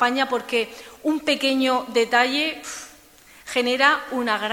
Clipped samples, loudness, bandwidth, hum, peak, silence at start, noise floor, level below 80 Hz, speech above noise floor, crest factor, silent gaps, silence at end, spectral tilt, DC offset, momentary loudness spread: under 0.1%; -21 LUFS; 18.5 kHz; none; -2 dBFS; 0 s; -50 dBFS; -62 dBFS; 28 dB; 20 dB; none; 0 s; -2 dB/octave; under 0.1%; 14 LU